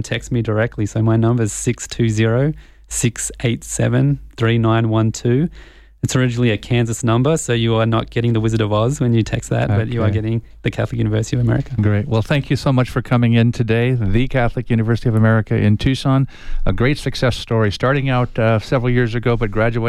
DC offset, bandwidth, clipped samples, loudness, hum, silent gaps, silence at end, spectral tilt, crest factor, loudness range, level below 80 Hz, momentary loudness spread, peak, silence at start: under 0.1%; 12.5 kHz; under 0.1%; -18 LUFS; none; none; 0 s; -6 dB/octave; 12 dB; 2 LU; -32 dBFS; 5 LU; -4 dBFS; 0 s